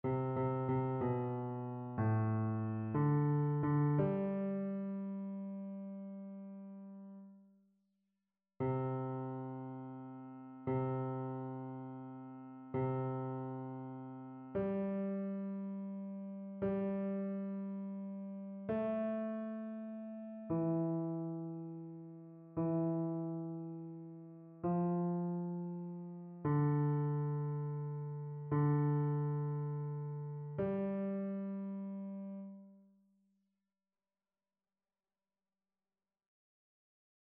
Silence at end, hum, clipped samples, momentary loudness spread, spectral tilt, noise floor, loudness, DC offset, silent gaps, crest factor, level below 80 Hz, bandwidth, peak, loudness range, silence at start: 4.4 s; none; under 0.1%; 15 LU; -11 dB/octave; under -90 dBFS; -39 LUFS; under 0.1%; none; 16 dB; -72 dBFS; 3.4 kHz; -22 dBFS; 9 LU; 0.05 s